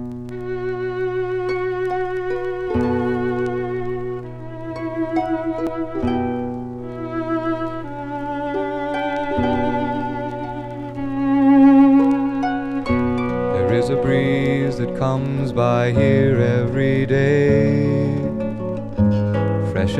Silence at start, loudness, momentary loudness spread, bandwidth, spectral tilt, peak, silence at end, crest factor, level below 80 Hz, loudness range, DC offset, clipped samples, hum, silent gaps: 0 s; -20 LUFS; 12 LU; 9 kHz; -8.5 dB/octave; -2 dBFS; 0 s; 16 dB; -42 dBFS; 8 LU; under 0.1%; under 0.1%; none; none